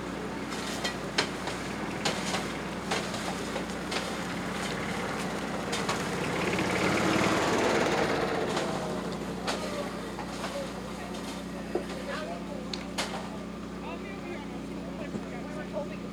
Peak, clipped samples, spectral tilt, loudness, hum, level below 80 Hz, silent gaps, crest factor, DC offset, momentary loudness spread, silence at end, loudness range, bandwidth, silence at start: -10 dBFS; under 0.1%; -4 dB/octave; -32 LUFS; none; -52 dBFS; none; 22 dB; under 0.1%; 12 LU; 0 s; 9 LU; over 20 kHz; 0 s